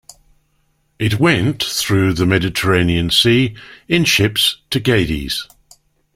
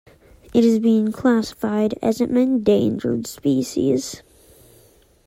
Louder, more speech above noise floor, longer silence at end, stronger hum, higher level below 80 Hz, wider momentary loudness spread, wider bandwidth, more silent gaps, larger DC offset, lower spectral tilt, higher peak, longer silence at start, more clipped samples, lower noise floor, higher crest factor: first, -15 LUFS vs -20 LUFS; first, 46 dB vs 35 dB; second, 0.7 s vs 1.1 s; neither; first, -38 dBFS vs -54 dBFS; about the same, 9 LU vs 7 LU; about the same, 16.5 kHz vs 15.5 kHz; neither; neither; second, -4.5 dB/octave vs -6 dB/octave; first, 0 dBFS vs -4 dBFS; first, 1 s vs 0.55 s; neither; first, -62 dBFS vs -53 dBFS; about the same, 16 dB vs 16 dB